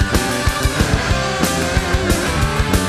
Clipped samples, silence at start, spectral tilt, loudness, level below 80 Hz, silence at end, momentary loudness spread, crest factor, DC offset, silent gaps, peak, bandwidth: under 0.1%; 0 s; -4.5 dB/octave; -17 LUFS; -24 dBFS; 0 s; 1 LU; 16 dB; under 0.1%; none; -2 dBFS; 14 kHz